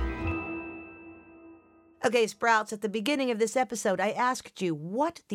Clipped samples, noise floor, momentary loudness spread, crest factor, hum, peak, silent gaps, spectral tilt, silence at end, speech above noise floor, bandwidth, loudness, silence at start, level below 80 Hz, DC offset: under 0.1%; -56 dBFS; 15 LU; 20 dB; none; -10 dBFS; none; -4 dB/octave; 0 s; 28 dB; 16 kHz; -29 LUFS; 0 s; -48 dBFS; under 0.1%